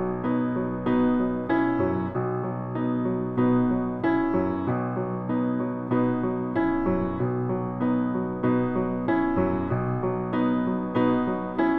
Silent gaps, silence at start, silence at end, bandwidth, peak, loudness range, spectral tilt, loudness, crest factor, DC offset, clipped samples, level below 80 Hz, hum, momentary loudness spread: none; 0 s; 0 s; 4.4 kHz; -10 dBFS; 1 LU; -11 dB/octave; -26 LUFS; 14 dB; under 0.1%; under 0.1%; -46 dBFS; none; 4 LU